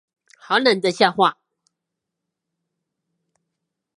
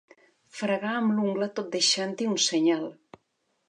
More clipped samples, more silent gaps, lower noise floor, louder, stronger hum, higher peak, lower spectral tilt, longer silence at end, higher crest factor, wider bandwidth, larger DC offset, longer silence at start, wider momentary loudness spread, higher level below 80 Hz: neither; neither; first, -82 dBFS vs -75 dBFS; first, -18 LUFS vs -26 LUFS; neither; first, 0 dBFS vs -10 dBFS; about the same, -4 dB/octave vs -3 dB/octave; first, 2.65 s vs 0.75 s; first, 24 dB vs 18 dB; about the same, 11.5 kHz vs 11 kHz; neither; about the same, 0.5 s vs 0.55 s; second, 3 LU vs 9 LU; first, -74 dBFS vs -82 dBFS